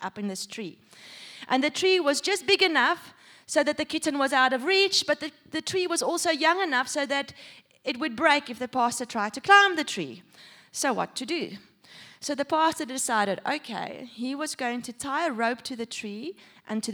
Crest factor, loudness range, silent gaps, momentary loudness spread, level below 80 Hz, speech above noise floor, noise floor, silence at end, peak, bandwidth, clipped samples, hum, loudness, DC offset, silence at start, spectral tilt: 22 dB; 6 LU; none; 15 LU; -72 dBFS; 24 dB; -51 dBFS; 0 s; -4 dBFS; over 20 kHz; under 0.1%; none; -25 LUFS; under 0.1%; 0 s; -2 dB/octave